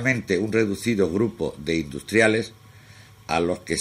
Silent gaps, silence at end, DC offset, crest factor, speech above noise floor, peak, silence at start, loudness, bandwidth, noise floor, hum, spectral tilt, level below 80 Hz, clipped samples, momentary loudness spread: none; 0 s; under 0.1%; 20 dB; 25 dB; -4 dBFS; 0 s; -23 LUFS; 16 kHz; -48 dBFS; none; -5 dB/octave; -50 dBFS; under 0.1%; 8 LU